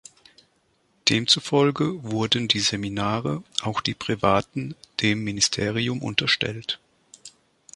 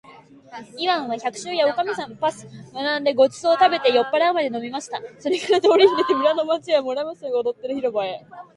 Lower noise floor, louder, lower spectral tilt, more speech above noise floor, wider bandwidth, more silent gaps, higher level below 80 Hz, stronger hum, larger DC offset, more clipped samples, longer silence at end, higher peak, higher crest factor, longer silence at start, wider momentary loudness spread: first, -66 dBFS vs -46 dBFS; about the same, -23 LUFS vs -21 LUFS; about the same, -3.5 dB/octave vs -3.5 dB/octave; first, 42 dB vs 25 dB; about the same, 11.5 kHz vs 11.5 kHz; neither; first, -54 dBFS vs -70 dBFS; neither; neither; neither; first, 0.45 s vs 0.1 s; about the same, -2 dBFS vs -2 dBFS; about the same, 22 dB vs 18 dB; first, 1.05 s vs 0.1 s; second, 8 LU vs 13 LU